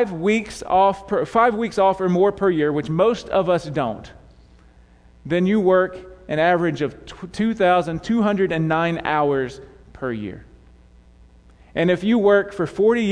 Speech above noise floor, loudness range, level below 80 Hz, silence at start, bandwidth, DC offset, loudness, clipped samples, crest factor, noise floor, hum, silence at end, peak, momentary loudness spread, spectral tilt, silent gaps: 31 dB; 5 LU; -48 dBFS; 0 s; 10.5 kHz; under 0.1%; -20 LUFS; under 0.1%; 16 dB; -50 dBFS; none; 0 s; -4 dBFS; 10 LU; -7 dB/octave; none